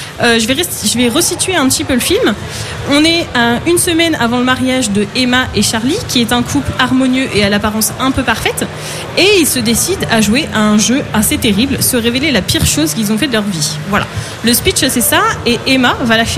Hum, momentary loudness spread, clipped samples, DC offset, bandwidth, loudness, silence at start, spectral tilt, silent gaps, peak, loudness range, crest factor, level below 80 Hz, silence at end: none; 5 LU; under 0.1%; under 0.1%; 16 kHz; -12 LUFS; 0 s; -3 dB/octave; none; 0 dBFS; 1 LU; 12 dB; -34 dBFS; 0 s